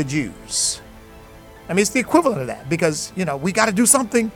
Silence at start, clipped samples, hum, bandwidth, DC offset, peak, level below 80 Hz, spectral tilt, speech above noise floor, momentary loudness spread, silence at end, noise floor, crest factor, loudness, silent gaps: 0 s; under 0.1%; none; 18 kHz; under 0.1%; 0 dBFS; -48 dBFS; -3.5 dB/octave; 23 dB; 10 LU; 0 s; -42 dBFS; 20 dB; -19 LUFS; none